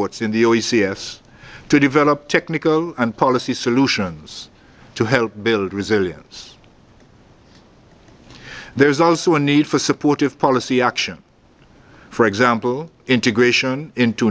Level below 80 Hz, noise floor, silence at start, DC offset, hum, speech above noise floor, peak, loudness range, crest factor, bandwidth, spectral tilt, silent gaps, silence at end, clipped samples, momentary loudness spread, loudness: -52 dBFS; -51 dBFS; 0 s; under 0.1%; none; 33 dB; 0 dBFS; 5 LU; 18 dB; 8 kHz; -5 dB/octave; none; 0 s; under 0.1%; 17 LU; -17 LUFS